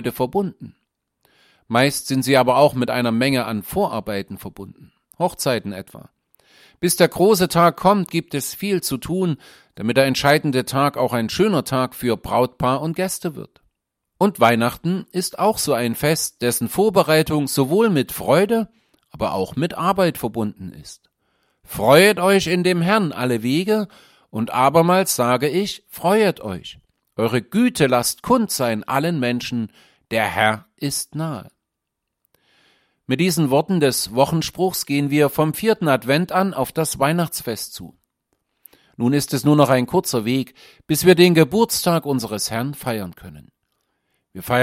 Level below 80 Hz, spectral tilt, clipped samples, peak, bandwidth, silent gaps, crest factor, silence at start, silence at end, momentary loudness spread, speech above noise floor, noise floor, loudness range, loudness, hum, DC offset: -52 dBFS; -5 dB/octave; under 0.1%; 0 dBFS; 16.5 kHz; none; 18 dB; 0 s; 0 s; 12 LU; 61 dB; -80 dBFS; 5 LU; -19 LUFS; none; under 0.1%